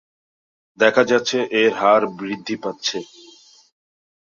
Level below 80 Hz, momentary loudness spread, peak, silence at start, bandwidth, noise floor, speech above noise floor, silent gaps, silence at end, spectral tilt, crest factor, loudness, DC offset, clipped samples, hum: -68 dBFS; 12 LU; -2 dBFS; 0.8 s; 7.4 kHz; -49 dBFS; 30 dB; none; 1.25 s; -3.5 dB/octave; 20 dB; -19 LUFS; under 0.1%; under 0.1%; none